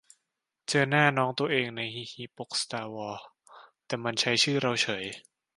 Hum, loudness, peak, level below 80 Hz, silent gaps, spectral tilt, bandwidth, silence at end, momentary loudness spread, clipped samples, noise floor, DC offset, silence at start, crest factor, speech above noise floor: none; -28 LUFS; -6 dBFS; -72 dBFS; none; -3.5 dB/octave; 11.5 kHz; 0.35 s; 17 LU; under 0.1%; -84 dBFS; under 0.1%; 0.7 s; 24 dB; 55 dB